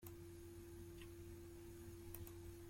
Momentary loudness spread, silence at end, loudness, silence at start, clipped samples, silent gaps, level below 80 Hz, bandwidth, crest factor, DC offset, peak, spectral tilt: 3 LU; 0 s; -57 LUFS; 0 s; under 0.1%; none; -64 dBFS; 16.5 kHz; 20 dB; under 0.1%; -36 dBFS; -5.5 dB/octave